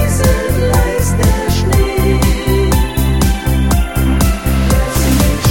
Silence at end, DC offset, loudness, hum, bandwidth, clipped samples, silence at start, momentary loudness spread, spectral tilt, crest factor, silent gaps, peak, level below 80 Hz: 0 s; 1%; -13 LUFS; none; 17.5 kHz; under 0.1%; 0 s; 2 LU; -5.5 dB/octave; 12 dB; none; 0 dBFS; -16 dBFS